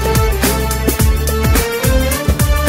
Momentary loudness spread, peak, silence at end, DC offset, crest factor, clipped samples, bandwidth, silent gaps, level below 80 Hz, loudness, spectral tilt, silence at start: 2 LU; 0 dBFS; 0 s; under 0.1%; 12 dB; under 0.1%; 16.5 kHz; none; -16 dBFS; -14 LUFS; -4.5 dB/octave; 0 s